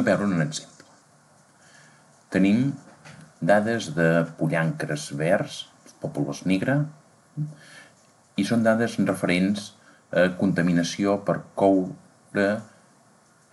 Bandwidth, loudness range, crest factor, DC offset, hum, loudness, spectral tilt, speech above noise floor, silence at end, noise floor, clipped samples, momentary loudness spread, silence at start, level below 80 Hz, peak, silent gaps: 12 kHz; 4 LU; 18 dB; under 0.1%; none; -24 LUFS; -6 dB/octave; 35 dB; 0.85 s; -58 dBFS; under 0.1%; 13 LU; 0 s; -64 dBFS; -6 dBFS; none